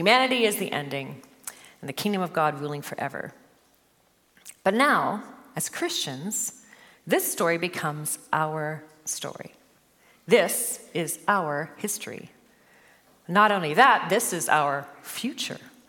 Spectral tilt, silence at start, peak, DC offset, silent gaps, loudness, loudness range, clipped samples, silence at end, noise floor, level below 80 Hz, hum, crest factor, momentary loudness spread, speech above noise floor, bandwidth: -3 dB/octave; 0 s; -2 dBFS; under 0.1%; none; -25 LUFS; 6 LU; under 0.1%; 0.2 s; -64 dBFS; -78 dBFS; none; 24 dB; 17 LU; 39 dB; 17.5 kHz